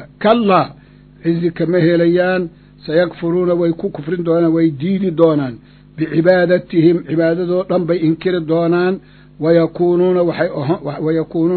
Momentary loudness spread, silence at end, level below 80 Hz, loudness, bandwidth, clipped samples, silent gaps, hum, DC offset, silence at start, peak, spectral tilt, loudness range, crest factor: 8 LU; 0 s; -50 dBFS; -15 LUFS; 4.5 kHz; under 0.1%; none; none; under 0.1%; 0 s; 0 dBFS; -11 dB/octave; 1 LU; 14 dB